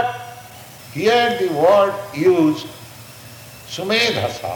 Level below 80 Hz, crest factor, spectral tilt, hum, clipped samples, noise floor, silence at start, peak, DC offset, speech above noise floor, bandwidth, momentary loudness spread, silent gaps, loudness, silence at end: -58 dBFS; 18 dB; -4.5 dB/octave; none; under 0.1%; -39 dBFS; 0 s; -2 dBFS; under 0.1%; 22 dB; 19.5 kHz; 23 LU; none; -17 LUFS; 0 s